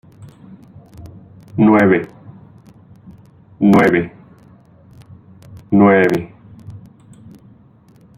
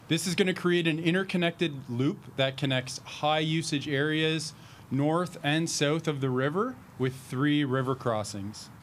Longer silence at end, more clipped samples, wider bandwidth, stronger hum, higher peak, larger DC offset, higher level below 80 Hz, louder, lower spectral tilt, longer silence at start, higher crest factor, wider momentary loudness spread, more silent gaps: first, 1.4 s vs 0 s; neither; second, 12.5 kHz vs 15.5 kHz; neither; first, -2 dBFS vs -10 dBFS; neither; first, -52 dBFS vs -68 dBFS; first, -13 LUFS vs -29 LUFS; first, -8.5 dB/octave vs -5 dB/octave; first, 0.2 s vs 0.05 s; about the same, 18 dB vs 20 dB; first, 25 LU vs 7 LU; neither